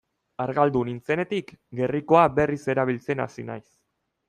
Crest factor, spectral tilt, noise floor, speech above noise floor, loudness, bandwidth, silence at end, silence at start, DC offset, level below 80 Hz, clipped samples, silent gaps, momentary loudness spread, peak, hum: 22 dB; -7.5 dB/octave; -76 dBFS; 52 dB; -24 LUFS; 11 kHz; 0.7 s; 0.4 s; under 0.1%; -56 dBFS; under 0.1%; none; 18 LU; -4 dBFS; none